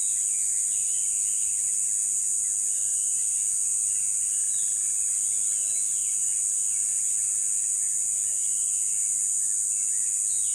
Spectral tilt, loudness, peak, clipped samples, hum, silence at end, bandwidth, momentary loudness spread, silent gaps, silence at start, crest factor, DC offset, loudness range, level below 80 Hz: 2.5 dB/octave; -23 LUFS; -12 dBFS; under 0.1%; none; 0 s; 16.5 kHz; 0 LU; none; 0 s; 14 dB; under 0.1%; 0 LU; -68 dBFS